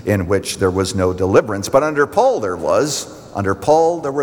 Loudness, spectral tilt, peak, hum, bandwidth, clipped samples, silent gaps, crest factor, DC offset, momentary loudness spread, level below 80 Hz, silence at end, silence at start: -17 LUFS; -5 dB/octave; -2 dBFS; none; over 20 kHz; under 0.1%; none; 14 dB; under 0.1%; 6 LU; -50 dBFS; 0 s; 0 s